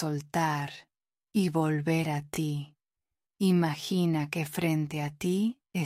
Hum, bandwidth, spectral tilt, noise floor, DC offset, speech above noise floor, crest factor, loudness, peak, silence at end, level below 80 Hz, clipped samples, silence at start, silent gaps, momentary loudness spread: none; 16 kHz; -6 dB/octave; under -90 dBFS; under 0.1%; over 61 dB; 14 dB; -30 LUFS; -14 dBFS; 0 s; -66 dBFS; under 0.1%; 0 s; none; 7 LU